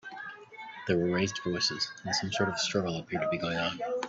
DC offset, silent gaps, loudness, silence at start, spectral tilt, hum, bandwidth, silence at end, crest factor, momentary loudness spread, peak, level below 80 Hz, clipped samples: under 0.1%; none; -31 LUFS; 0.05 s; -4 dB/octave; none; 8 kHz; 0 s; 18 dB; 14 LU; -12 dBFS; -66 dBFS; under 0.1%